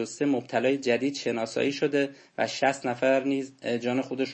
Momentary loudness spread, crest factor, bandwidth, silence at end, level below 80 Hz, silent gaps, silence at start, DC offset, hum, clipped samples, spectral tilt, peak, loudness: 6 LU; 18 dB; 8.8 kHz; 0 s; -76 dBFS; none; 0 s; under 0.1%; none; under 0.1%; -4.5 dB/octave; -10 dBFS; -27 LUFS